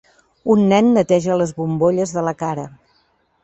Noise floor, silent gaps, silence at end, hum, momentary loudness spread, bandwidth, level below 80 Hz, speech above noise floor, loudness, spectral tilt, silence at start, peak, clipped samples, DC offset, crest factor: -61 dBFS; none; 0.7 s; none; 13 LU; 8.4 kHz; -56 dBFS; 45 dB; -17 LUFS; -6.5 dB/octave; 0.45 s; -2 dBFS; under 0.1%; under 0.1%; 16 dB